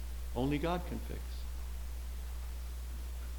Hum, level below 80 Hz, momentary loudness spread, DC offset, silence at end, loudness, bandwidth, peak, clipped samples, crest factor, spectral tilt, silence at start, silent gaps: 60 Hz at -40 dBFS; -40 dBFS; 9 LU; under 0.1%; 0 s; -40 LUFS; 19 kHz; -20 dBFS; under 0.1%; 18 dB; -6 dB/octave; 0 s; none